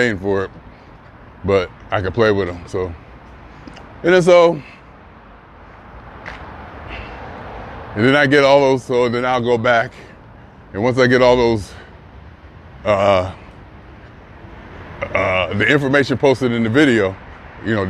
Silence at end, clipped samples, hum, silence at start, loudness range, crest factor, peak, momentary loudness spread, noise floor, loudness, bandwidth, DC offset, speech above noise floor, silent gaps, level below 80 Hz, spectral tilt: 0 s; under 0.1%; none; 0 s; 7 LU; 18 dB; 0 dBFS; 23 LU; -42 dBFS; -16 LUFS; 11.5 kHz; under 0.1%; 27 dB; none; -42 dBFS; -6 dB/octave